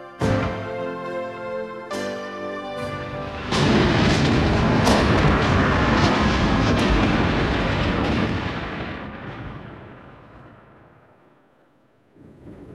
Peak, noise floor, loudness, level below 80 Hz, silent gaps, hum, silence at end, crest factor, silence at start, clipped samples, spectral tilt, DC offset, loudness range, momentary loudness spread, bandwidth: -2 dBFS; -59 dBFS; -21 LUFS; -32 dBFS; none; none; 0 s; 20 dB; 0 s; under 0.1%; -6 dB/octave; under 0.1%; 14 LU; 14 LU; 13.5 kHz